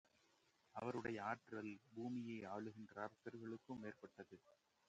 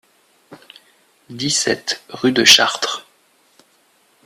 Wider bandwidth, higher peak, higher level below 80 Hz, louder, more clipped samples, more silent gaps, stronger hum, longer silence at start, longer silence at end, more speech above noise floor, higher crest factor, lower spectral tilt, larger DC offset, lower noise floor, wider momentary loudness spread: second, 8.8 kHz vs 15.5 kHz; second, -30 dBFS vs 0 dBFS; second, -84 dBFS vs -60 dBFS; second, -51 LUFS vs -14 LUFS; neither; neither; neither; first, 0.75 s vs 0.5 s; second, 0.35 s vs 1.25 s; second, 28 dB vs 41 dB; about the same, 22 dB vs 20 dB; first, -7 dB/octave vs -1.5 dB/octave; neither; first, -79 dBFS vs -58 dBFS; second, 13 LU vs 16 LU